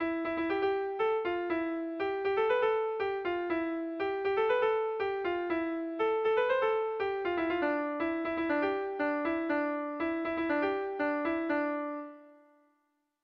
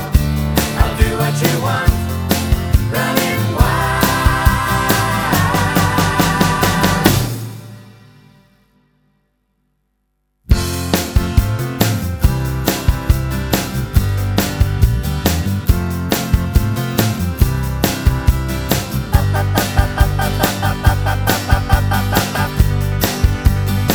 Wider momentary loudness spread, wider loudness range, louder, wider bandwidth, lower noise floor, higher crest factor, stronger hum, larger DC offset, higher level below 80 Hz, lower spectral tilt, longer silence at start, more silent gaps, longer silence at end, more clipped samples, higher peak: about the same, 6 LU vs 4 LU; second, 2 LU vs 5 LU; second, -32 LUFS vs -16 LUFS; second, 6 kHz vs over 20 kHz; first, -77 dBFS vs -67 dBFS; about the same, 14 dB vs 16 dB; second, none vs 50 Hz at -40 dBFS; neither; second, -66 dBFS vs -20 dBFS; first, -6.5 dB/octave vs -5 dB/octave; about the same, 0 s vs 0 s; neither; first, 0.9 s vs 0 s; neither; second, -18 dBFS vs 0 dBFS